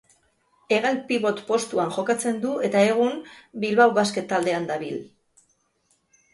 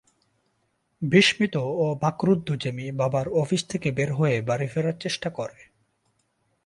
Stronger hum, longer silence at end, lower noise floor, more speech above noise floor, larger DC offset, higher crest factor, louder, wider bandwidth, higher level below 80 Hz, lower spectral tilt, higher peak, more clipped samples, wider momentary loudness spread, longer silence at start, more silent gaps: neither; about the same, 1.25 s vs 1.15 s; second, -68 dBFS vs -72 dBFS; about the same, 45 dB vs 48 dB; neither; about the same, 20 dB vs 22 dB; about the same, -23 LUFS vs -24 LUFS; about the same, 11.5 kHz vs 11.5 kHz; second, -70 dBFS vs -60 dBFS; about the same, -4.5 dB/octave vs -5.5 dB/octave; about the same, -6 dBFS vs -4 dBFS; neither; about the same, 11 LU vs 10 LU; second, 0.7 s vs 1 s; neither